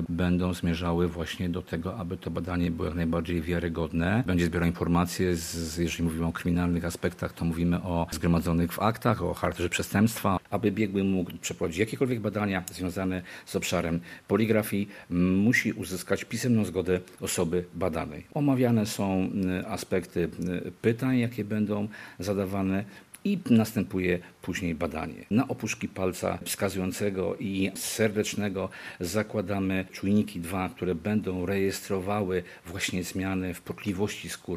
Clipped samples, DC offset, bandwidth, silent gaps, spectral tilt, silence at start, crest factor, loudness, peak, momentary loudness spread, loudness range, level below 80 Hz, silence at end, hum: under 0.1%; under 0.1%; 14.5 kHz; none; -6 dB/octave; 0 s; 22 dB; -29 LUFS; -6 dBFS; 7 LU; 3 LU; -50 dBFS; 0 s; none